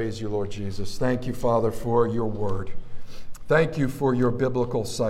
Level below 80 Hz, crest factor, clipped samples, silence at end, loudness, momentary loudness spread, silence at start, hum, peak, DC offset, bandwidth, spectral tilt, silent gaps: -40 dBFS; 16 dB; under 0.1%; 0 s; -25 LUFS; 9 LU; 0 s; none; -6 dBFS; under 0.1%; 14 kHz; -6.5 dB/octave; none